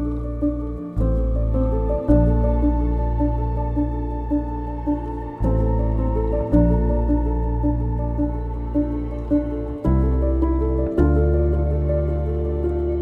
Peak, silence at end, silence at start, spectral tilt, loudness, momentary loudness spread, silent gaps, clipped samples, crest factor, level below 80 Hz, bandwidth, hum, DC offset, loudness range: -4 dBFS; 0 s; 0 s; -11.5 dB/octave; -22 LUFS; 7 LU; none; under 0.1%; 16 dB; -22 dBFS; 2.9 kHz; none; under 0.1%; 3 LU